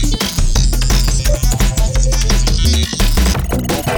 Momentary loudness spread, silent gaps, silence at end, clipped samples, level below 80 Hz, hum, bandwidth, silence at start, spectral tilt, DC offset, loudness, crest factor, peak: 3 LU; none; 0 s; under 0.1%; -14 dBFS; none; over 20 kHz; 0 s; -4 dB/octave; under 0.1%; -15 LUFS; 12 dB; 0 dBFS